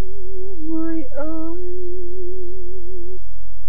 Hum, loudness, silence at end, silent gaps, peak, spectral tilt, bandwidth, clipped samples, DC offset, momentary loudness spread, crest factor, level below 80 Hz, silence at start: none; -31 LUFS; 0 s; none; -6 dBFS; -10 dB/octave; 10.5 kHz; under 0.1%; 40%; 12 LU; 12 dB; -40 dBFS; 0 s